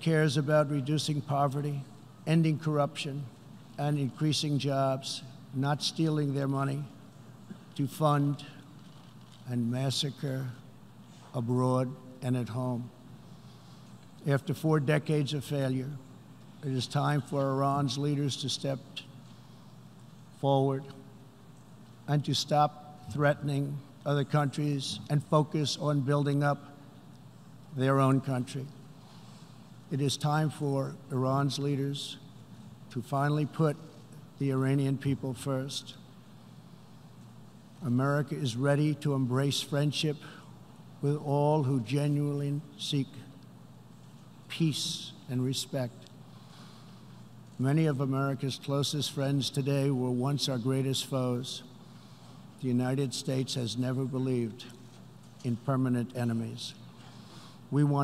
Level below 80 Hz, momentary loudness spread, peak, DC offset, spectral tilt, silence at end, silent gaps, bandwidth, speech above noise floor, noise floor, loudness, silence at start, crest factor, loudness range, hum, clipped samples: -72 dBFS; 23 LU; -10 dBFS; under 0.1%; -6 dB/octave; 0 s; none; 14.5 kHz; 23 dB; -53 dBFS; -31 LUFS; 0 s; 22 dB; 4 LU; none; under 0.1%